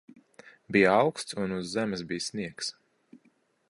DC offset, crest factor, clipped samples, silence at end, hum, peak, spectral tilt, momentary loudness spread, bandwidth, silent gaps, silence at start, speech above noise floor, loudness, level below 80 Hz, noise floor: under 0.1%; 22 dB; under 0.1%; 1 s; none; -8 dBFS; -4.5 dB/octave; 12 LU; 11.5 kHz; none; 0.45 s; 40 dB; -28 LUFS; -64 dBFS; -68 dBFS